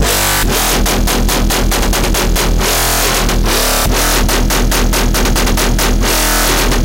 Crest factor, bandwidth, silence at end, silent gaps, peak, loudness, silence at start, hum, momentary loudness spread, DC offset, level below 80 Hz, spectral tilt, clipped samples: 12 dB; 17 kHz; 0 s; none; 0 dBFS; -12 LUFS; 0 s; none; 2 LU; under 0.1%; -14 dBFS; -3 dB/octave; under 0.1%